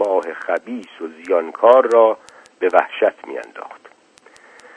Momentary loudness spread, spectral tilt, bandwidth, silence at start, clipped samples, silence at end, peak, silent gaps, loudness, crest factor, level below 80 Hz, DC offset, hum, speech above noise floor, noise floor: 20 LU; -4 dB/octave; 10 kHz; 0 s; under 0.1%; 1 s; 0 dBFS; none; -16 LUFS; 18 dB; -72 dBFS; under 0.1%; none; 33 dB; -50 dBFS